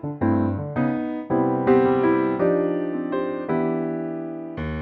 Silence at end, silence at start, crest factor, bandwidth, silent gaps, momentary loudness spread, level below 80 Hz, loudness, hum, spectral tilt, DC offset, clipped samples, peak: 0 s; 0 s; 16 dB; 4.5 kHz; none; 11 LU; -48 dBFS; -23 LUFS; none; -11 dB/octave; under 0.1%; under 0.1%; -6 dBFS